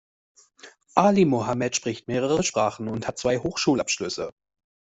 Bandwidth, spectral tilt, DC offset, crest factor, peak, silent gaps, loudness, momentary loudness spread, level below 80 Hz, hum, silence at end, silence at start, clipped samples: 8.2 kHz; -4.5 dB/octave; under 0.1%; 22 dB; -4 dBFS; none; -24 LUFS; 10 LU; -56 dBFS; none; 0.7 s; 0.65 s; under 0.1%